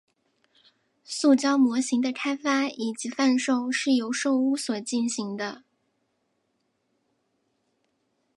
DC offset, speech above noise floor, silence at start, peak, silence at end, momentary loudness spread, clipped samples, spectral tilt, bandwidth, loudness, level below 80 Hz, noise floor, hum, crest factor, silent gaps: under 0.1%; 50 dB; 1.1 s; -10 dBFS; 2.8 s; 9 LU; under 0.1%; -3 dB/octave; 11.5 kHz; -25 LUFS; -82 dBFS; -74 dBFS; none; 18 dB; none